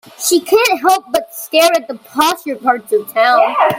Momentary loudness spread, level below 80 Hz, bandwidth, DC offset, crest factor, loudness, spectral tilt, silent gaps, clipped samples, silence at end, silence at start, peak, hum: 7 LU; -58 dBFS; 17 kHz; under 0.1%; 14 dB; -14 LUFS; -2 dB/octave; none; under 0.1%; 0 s; 0.2 s; 0 dBFS; none